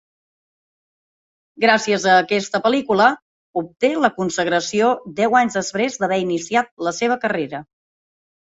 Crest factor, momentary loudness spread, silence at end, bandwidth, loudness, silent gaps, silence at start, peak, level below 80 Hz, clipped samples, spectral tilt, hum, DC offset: 20 dB; 9 LU; 0.8 s; 8 kHz; -19 LUFS; 3.22-3.53 s, 6.71-6.77 s; 1.6 s; 0 dBFS; -64 dBFS; under 0.1%; -4 dB/octave; none; under 0.1%